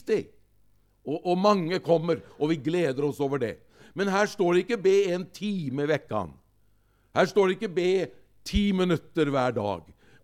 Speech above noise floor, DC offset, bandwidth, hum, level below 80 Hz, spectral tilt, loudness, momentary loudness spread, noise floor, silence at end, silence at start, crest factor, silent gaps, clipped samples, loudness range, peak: 39 dB; under 0.1%; 14 kHz; none; -48 dBFS; -6 dB/octave; -26 LUFS; 10 LU; -65 dBFS; 0.45 s; 0.05 s; 18 dB; none; under 0.1%; 1 LU; -8 dBFS